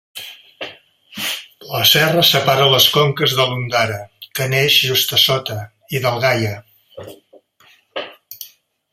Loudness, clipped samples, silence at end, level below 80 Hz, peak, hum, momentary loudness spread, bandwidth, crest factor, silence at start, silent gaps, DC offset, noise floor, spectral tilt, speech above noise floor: -14 LUFS; under 0.1%; 0.45 s; -56 dBFS; 0 dBFS; none; 22 LU; 16 kHz; 18 dB; 0.15 s; none; under 0.1%; -53 dBFS; -3 dB/octave; 37 dB